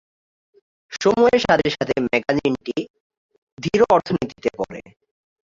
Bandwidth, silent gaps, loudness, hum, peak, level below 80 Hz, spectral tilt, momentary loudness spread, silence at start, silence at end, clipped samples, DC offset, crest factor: 7.6 kHz; 2.90-2.94 s, 3.00-3.10 s, 3.17-3.29 s, 3.38-3.57 s; -20 LUFS; none; -2 dBFS; -52 dBFS; -5.5 dB/octave; 14 LU; 0.9 s; 0.8 s; under 0.1%; under 0.1%; 20 dB